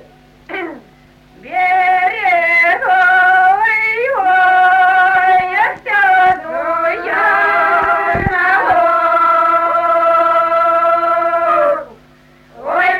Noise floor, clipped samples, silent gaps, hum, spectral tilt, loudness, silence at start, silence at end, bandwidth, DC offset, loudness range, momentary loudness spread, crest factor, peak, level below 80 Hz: -45 dBFS; under 0.1%; none; none; -5 dB/octave; -12 LUFS; 0.5 s; 0 s; 13 kHz; under 0.1%; 2 LU; 7 LU; 12 dB; -2 dBFS; -44 dBFS